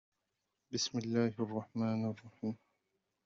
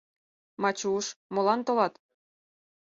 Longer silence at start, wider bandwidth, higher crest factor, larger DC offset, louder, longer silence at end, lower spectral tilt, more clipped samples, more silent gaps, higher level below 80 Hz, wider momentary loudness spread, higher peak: about the same, 0.7 s vs 0.6 s; about the same, 7.4 kHz vs 7.8 kHz; about the same, 18 dB vs 20 dB; neither; second, -38 LUFS vs -28 LUFS; second, 0.7 s vs 1.05 s; first, -5.5 dB/octave vs -4 dB/octave; neither; second, none vs 1.16-1.30 s; about the same, -78 dBFS vs -76 dBFS; first, 9 LU vs 6 LU; second, -20 dBFS vs -10 dBFS